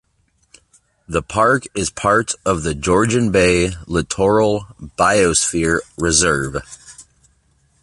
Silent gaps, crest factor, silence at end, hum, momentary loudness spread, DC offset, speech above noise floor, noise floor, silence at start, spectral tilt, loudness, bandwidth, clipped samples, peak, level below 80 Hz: none; 18 dB; 0.8 s; none; 10 LU; under 0.1%; 45 dB; -62 dBFS; 1.1 s; -4 dB/octave; -17 LUFS; 11.5 kHz; under 0.1%; 0 dBFS; -38 dBFS